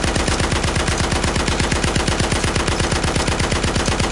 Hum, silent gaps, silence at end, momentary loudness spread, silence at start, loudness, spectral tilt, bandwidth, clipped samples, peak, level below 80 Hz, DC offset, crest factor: none; none; 0 s; 1 LU; 0 s; -18 LUFS; -4 dB/octave; 11.5 kHz; under 0.1%; 0 dBFS; -26 dBFS; under 0.1%; 18 dB